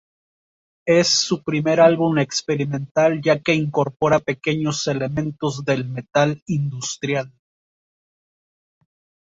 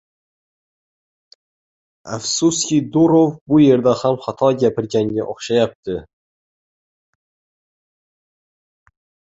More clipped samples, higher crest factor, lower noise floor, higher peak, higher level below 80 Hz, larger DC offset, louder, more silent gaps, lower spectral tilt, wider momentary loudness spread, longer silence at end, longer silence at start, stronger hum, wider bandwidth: neither; about the same, 18 dB vs 18 dB; about the same, under -90 dBFS vs under -90 dBFS; about the same, -2 dBFS vs -2 dBFS; about the same, -58 dBFS vs -56 dBFS; neither; second, -20 LUFS vs -17 LUFS; about the same, 2.91-2.95 s, 6.42-6.46 s vs 3.41-3.46 s, 5.75-5.83 s; about the same, -4.5 dB/octave vs -5.5 dB/octave; about the same, 10 LU vs 12 LU; second, 2 s vs 3.35 s; second, 0.85 s vs 2.05 s; neither; about the same, 8 kHz vs 8.2 kHz